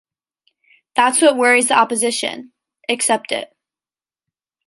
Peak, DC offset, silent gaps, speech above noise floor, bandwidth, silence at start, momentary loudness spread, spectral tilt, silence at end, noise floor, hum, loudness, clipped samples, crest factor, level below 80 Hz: 0 dBFS; under 0.1%; none; over 74 dB; 12 kHz; 0.95 s; 14 LU; -1 dB/octave; 1.2 s; under -90 dBFS; none; -16 LUFS; under 0.1%; 18 dB; -72 dBFS